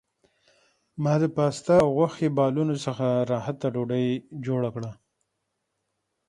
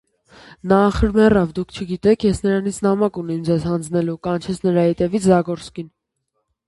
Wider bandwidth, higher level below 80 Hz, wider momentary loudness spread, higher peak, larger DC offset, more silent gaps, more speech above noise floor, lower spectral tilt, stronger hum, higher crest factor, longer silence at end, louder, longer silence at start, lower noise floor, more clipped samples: about the same, 11.5 kHz vs 11.5 kHz; second, -60 dBFS vs -36 dBFS; about the same, 10 LU vs 12 LU; second, -6 dBFS vs -2 dBFS; neither; neither; about the same, 55 dB vs 56 dB; about the same, -7.5 dB/octave vs -7 dB/octave; neither; about the same, 20 dB vs 18 dB; first, 1.35 s vs 0.8 s; second, -25 LUFS vs -18 LUFS; first, 0.95 s vs 0.65 s; first, -79 dBFS vs -74 dBFS; neither